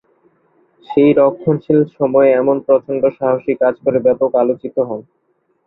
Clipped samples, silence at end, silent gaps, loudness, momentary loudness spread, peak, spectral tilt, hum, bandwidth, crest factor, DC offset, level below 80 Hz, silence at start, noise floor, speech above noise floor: under 0.1%; 0.65 s; none; -15 LUFS; 8 LU; 0 dBFS; -11.5 dB/octave; none; 4.1 kHz; 14 dB; under 0.1%; -58 dBFS; 0.9 s; -57 dBFS; 43 dB